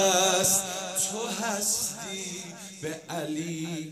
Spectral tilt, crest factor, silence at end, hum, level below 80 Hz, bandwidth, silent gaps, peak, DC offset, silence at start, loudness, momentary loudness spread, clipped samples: -2 dB/octave; 20 dB; 0 s; none; -68 dBFS; 15.5 kHz; none; -10 dBFS; under 0.1%; 0 s; -27 LUFS; 15 LU; under 0.1%